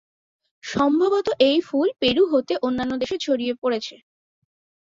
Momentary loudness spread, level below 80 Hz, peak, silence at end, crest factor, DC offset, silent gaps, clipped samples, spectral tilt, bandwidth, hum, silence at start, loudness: 8 LU; -56 dBFS; -6 dBFS; 1 s; 18 dB; under 0.1%; none; under 0.1%; -4.5 dB/octave; 7.8 kHz; none; 0.65 s; -21 LUFS